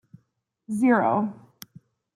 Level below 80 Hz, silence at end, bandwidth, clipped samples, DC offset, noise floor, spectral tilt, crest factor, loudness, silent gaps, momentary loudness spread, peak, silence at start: -74 dBFS; 0.85 s; 15 kHz; under 0.1%; under 0.1%; -72 dBFS; -7 dB/octave; 20 dB; -23 LUFS; none; 14 LU; -8 dBFS; 0.7 s